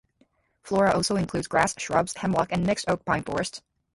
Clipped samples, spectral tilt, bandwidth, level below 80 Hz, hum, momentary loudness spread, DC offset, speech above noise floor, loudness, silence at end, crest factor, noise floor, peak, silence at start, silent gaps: under 0.1%; -4.5 dB/octave; 11.5 kHz; -52 dBFS; none; 7 LU; under 0.1%; 41 dB; -25 LUFS; 0.35 s; 20 dB; -66 dBFS; -8 dBFS; 0.65 s; none